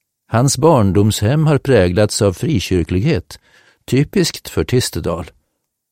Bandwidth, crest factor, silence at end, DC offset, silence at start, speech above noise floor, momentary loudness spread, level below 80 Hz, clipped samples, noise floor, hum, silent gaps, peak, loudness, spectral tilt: 16.5 kHz; 14 dB; 0.6 s; 0.3%; 0.3 s; 56 dB; 9 LU; -38 dBFS; under 0.1%; -71 dBFS; none; none; 0 dBFS; -15 LUFS; -5.5 dB/octave